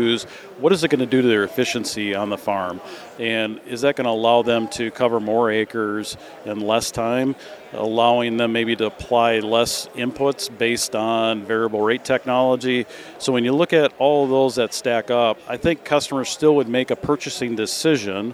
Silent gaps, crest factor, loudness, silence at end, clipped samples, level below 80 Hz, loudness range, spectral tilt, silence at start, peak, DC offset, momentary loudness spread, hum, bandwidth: none; 18 dB; -20 LUFS; 0 s; under 0.1%; -54 dBFS; 3 LU; -4 dB/octave; 0 s; -4 dBFS; under 0.1%; 8 LU; none; 15.5 kHz